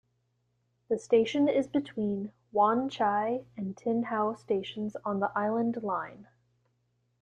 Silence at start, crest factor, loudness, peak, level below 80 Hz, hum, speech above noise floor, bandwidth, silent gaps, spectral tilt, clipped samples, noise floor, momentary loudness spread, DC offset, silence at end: 0.9 s; 18 dB; -30 LUFS; -12 dBFS; -72 dBFS; 60 Hz at -55 dBFS; 46 dB; 9.6 kHz; none; -6.5 dB/octave; under 0.1%; -75 dBFS; 9 LU; under 0.1%; 1 s